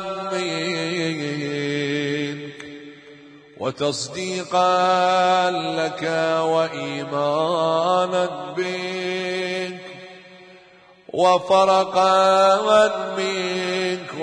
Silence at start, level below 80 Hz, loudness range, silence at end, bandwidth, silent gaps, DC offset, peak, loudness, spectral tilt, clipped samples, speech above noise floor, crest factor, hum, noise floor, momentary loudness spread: 0 s; -68 dBFS; 8 LU; 0 s; 10.5 kHz; none; under 0.1%; -6 dBFS; -21 LUFS; -4 dB/octave; under 0.1%; 31 dB; 16 dB; none; -50 dBFS; 13 LU